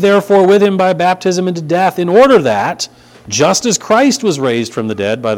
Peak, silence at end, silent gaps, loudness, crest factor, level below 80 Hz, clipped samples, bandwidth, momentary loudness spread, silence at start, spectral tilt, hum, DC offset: 0 dBFS; 0 s; none; -12 LUFS; 12 dB; -52 dBFS; 0.2%; 16.5 kHz; 9 LU; 0 s; -4.5 dB/octave; none; under 0.1%